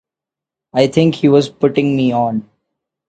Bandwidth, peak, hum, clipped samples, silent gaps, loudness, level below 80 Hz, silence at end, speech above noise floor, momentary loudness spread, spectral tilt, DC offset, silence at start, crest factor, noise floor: 9 kHz; 0 dBFS; none; under 0.1%; none; -15 LUFS; -56 dBFS; 0.7 s; 73 dB; 7 LU; -7 dB/octave; under 0.1%; 0.75 s; 16 dB; -86 dBFS